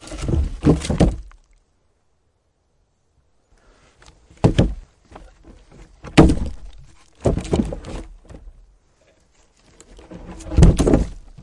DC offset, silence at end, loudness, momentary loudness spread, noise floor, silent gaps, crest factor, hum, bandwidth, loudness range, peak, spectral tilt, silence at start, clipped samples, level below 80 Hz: under 0.1%; 0 s; -19 LUFS; 25 LU; -65 dBFS; none; 20 dB; none; 11.5 kHz; 7 LU; -2 dBFS; -7 dB/octave; 0.05 s; under 0.1%; -28 dBFS